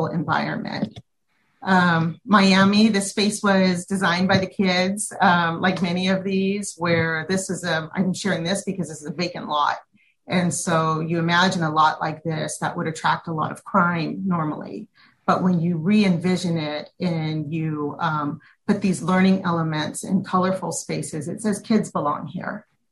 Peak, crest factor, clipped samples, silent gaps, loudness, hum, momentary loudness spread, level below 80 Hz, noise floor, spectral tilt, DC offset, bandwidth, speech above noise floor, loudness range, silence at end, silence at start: -4 dBFS; 18 dB; under 0.1%; none; -22 LUFS; none; 10 LU; -58 dBFS; -69 dBFS; -5 dB/octave; under 0.1%; 12.5 kHz; 48 dB; 5 LU; 0.3 s; 0 s